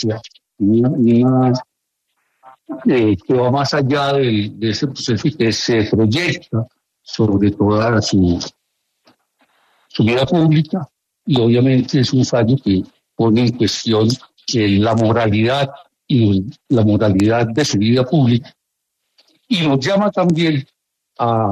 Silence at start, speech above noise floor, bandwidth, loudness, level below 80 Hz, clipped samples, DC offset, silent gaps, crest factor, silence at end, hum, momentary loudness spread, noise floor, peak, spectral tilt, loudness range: 0 s; 60 dB; 10.5 kHz; -16 LUFS; -48 dBFS; under 0.1%; under 0.1%; none; 14 dB; 0 s; none; 9 LU; -75 dBFS; -2 dBFS; -6.5 dB/octave; 3 LU